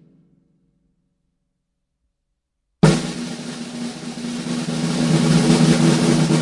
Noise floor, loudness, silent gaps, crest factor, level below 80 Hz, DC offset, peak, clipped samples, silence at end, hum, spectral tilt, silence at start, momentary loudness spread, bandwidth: -75 dBFS; -18 LUFS; none; 20 dB; -48 dBFS; under 0.1%; 0 dBFS; under 0.1%; 0 s; none; -5.5 dB/octave; 2.85 s; 15 LU; 11.5 kHz